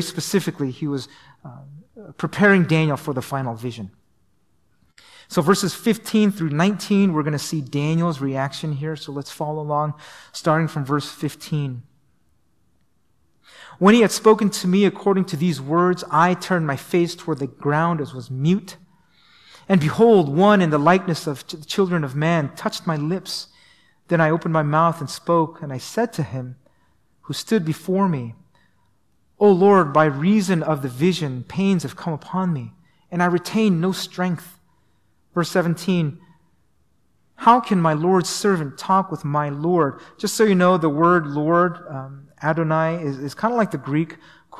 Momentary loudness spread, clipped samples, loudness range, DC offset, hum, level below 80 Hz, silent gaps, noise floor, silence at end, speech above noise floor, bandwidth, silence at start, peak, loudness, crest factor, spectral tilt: 14 LU; under 0.1%; 6 LU; 0.1%; none; -62 dBFS; none; -67 dBFS; 0 s; 47 dB; 15 kHz; 0 s; -2 dBFS; -20 LUFS; 18 dB; -6 dB/octave